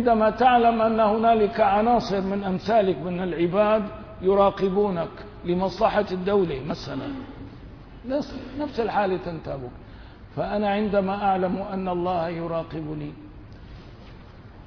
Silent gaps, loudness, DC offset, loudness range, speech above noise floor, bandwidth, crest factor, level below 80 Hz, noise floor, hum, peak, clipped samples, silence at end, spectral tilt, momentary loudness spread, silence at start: none; -23 LUFS; under 0.1%; 8 LU; 21 dB; 5.4 kHz; 18 dB; -46 dBFS; -44 dBFS; none; -6 dBFS; under 0.1%; 0 s; -7.5 dB/octave; 19 LU; 0 s